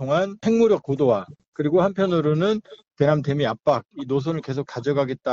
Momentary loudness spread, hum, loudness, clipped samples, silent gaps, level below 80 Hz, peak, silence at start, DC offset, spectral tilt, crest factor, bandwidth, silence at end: 7 LU; none; -22 LUFS; under 0.1%; 1.48-1.52 s; -58 dBFS; -6 dBFS; 0 s; under 0.1%; -7.5 dB/octave; 16 dB; 7.4 kHz; 0 s